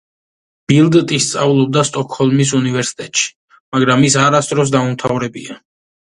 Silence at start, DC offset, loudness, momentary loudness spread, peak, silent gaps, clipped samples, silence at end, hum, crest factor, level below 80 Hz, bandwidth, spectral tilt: 0.7 s; under 0.1%; -14 LUFS; 10 LU; 0 dBFS; 3.36-3.48 s, 3.60-3.72 s; under 0.1%; 0.6 s; none; 14 dB; -52 dBFS; 11.5 kHz; -4.5 dB/octave